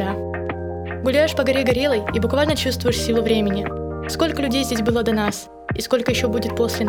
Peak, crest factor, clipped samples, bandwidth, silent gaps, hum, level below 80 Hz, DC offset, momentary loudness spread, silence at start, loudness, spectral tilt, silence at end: -6 dBFS; 16 dB; under 0.1%; 19.5 kHz; none; none; -38 dBFS; under 0.1%; 9 LU; 0 s; -21 LUFS; -5 dB/octave; 0 s